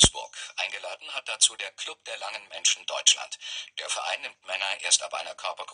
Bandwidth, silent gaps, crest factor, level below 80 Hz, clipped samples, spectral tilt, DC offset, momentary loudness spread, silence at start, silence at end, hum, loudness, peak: 10.5 kHz; none; 26 dB; -48 dBFS; under 0.1%; 0 dB/octave; under 0.1%; 14 LU; 0 s; 0 s; none; -26 LUFS; -2 dBFS